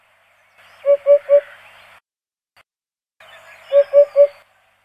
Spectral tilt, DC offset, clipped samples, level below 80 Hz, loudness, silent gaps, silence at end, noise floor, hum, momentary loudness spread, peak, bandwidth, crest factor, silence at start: -3 dB/octave; under 0.1%; under 0.1%; -76 dBFS; -15 LUFS; none; 0.55 s; under -90 dBFS; none; 5 LU; -2 dBFS; 5.2 kHz; 16 dB; 0.85 s